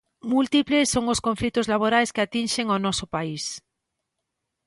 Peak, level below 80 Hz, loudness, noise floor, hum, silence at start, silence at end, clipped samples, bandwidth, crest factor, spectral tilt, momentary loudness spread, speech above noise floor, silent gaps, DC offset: -8 dBFS; -52 dBFS; -23 LUFS; -81 dBFS; none; 0.25 s; 1.1 s; under 0.1%; 11.5 kHz; 18 dB; -3.5 dB/octave; 9 LU; 58 dB; none; under 0.1%